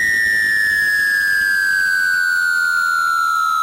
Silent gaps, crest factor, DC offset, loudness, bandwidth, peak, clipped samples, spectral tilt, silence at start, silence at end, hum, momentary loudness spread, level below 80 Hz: none; 6 dB; under 0.1%; -15 LUFS; 16 kHz; -10 dBFS; under 0.1%; 0.5 dB/octave; 0 s; 0 s; none; 2 LU; -52 dBFS